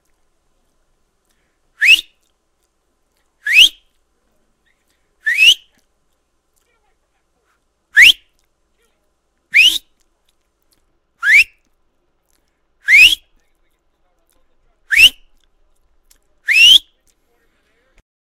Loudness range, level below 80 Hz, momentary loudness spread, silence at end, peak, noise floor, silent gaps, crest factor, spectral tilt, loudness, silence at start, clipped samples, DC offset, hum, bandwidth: 5 LU; -50 dBFS; 14 LU; 1.5 s; 0 dBFS; -65 dBFS; none; 18 dB; 3 dB/octave; -9 LUFS; 1.8 s; 0.1%; under 0.1%; none; 17 kHz